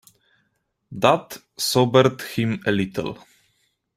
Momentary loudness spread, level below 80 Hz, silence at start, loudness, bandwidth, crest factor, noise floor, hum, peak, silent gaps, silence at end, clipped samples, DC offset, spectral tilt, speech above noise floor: 19 LU; -58 dBFS; 0.9 s; -21 LUFS; 16 kHz; 22 dB; -72 dBFS; none; -2 dBFS; none; 0.8 s; under 0.1%; under 0.1%; -5 dB/octave; 51 dB